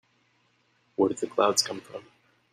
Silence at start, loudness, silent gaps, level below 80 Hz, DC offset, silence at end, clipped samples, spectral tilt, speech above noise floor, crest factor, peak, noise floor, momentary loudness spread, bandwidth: 1 s; -26 LUFS; none; -74 dBFS; under 0.1%; 0.5 s; under 0.1%; -2.5 dB/octave; 41 dB; 22 dB; -8 dBFS; -68 dBFS; 19 LU; 14.5 kHz